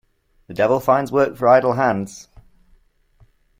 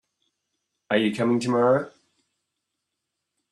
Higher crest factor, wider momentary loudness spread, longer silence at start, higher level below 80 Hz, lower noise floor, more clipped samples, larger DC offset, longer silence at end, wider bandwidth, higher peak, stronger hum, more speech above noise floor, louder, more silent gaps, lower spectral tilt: about the same, 18 dB vs 20 dB; first, 13 LU vs 5 LU; second, 0.5 s vs 0.9 s; first, -54 dBFS vs -72 dBFS; second, -56 dBFS vs -82 dBFS; neither; neither; second, 1.4 s vs 1.6 s; first, 16.5 kHz vs 11.5 kHz; first, -2 dBFS vs -8 dBFS; neither; second, 39 dB vs 60 dB; first, -17 LUFS vs -23 LUFS; neither; about the same, -6.5 dB/octave vs -6 dB/octave